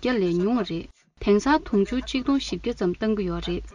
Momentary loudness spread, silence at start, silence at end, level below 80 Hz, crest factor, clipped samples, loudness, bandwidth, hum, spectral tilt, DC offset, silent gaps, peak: 8 LU; 0 s; 0.05 s; -42 dBFS; 16 dB; under 0.1%; -25 LUFS; 10 kHz; none; -6 dB/octave; under 0.1%; none; -8 dBFS